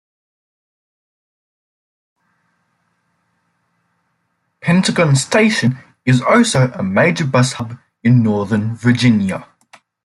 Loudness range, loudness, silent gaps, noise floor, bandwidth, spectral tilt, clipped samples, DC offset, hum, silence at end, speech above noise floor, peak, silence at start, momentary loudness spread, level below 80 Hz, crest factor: 6 LU; -15 LUFS; none; -68 dBFS; 12 kHz; -5.5 dB/octave; under 0.1%; under 0.1%; none; 0.6 s; 54 dB; -2 dBFS; 4.65 s; 10 LU; -54 dBFS; 16 dB